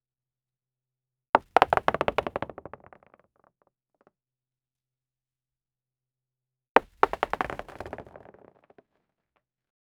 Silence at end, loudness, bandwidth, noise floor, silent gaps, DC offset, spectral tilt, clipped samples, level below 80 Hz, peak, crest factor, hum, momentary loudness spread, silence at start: 1.95 s; -26 LUFS; over 20 kHz; under -90 dBFS; 6.69-6.75 s; under 0.1%; -5 dB/octave; under 0.1%; -58 dBFS; 0 dBFS; 32 dB; none; 19 LU; 1.35 s